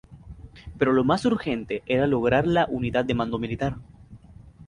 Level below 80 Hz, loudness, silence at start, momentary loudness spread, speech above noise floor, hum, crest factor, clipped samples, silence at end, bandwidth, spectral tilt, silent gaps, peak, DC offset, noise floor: -46 dBFS; -24 LUFS; 0.1 s; 21 LU; 24 dB; none; 18 dB; under 0.1%; 0 s; 10.5 kHz; -7 dB/octave; none; -6 dBFS; under 0.1%; -48 dBFS